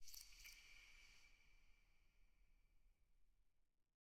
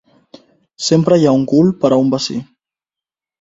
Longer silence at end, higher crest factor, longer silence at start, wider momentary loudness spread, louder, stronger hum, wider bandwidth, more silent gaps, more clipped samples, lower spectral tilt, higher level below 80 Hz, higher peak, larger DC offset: second, 0.05 s vs 1 s; first, 24 dB vs 16 dB; second, 0 s vs 0.8 s; about the same, 8 LU vs 10 LU; second, -63 LUFS vs -14 LUFS; neither; first, 16.5 kHz vs 8 kHz; neither; neither; second, 0.5 dB/octave vs -6 dB/octave; second, -76 dBFS vs -54 dBFS; second, -42 dBFS vs 0 dBFS; neither